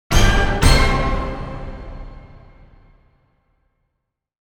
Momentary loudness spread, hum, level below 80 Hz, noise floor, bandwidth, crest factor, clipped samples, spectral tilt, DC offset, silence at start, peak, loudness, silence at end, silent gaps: 22 LU; none; -22 dBFS; -77 dBFS; 17.5 kHz; 20 dB; under 0.1%; -4.5 dB/octave; under 0.1%; 0.1 s; 0 dBFS; -18 LUFS; 2.15 s; none